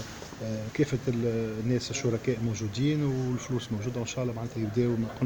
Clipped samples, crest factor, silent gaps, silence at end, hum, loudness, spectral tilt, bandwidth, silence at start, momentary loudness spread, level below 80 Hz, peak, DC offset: under 0.1%; 16 dB; none; 0 s; none; -30 LUFS; -6 dB/octave; over 20 kHz; 0 s; 6 LU; -52 dBFS; -14 dBFS; under 0.1%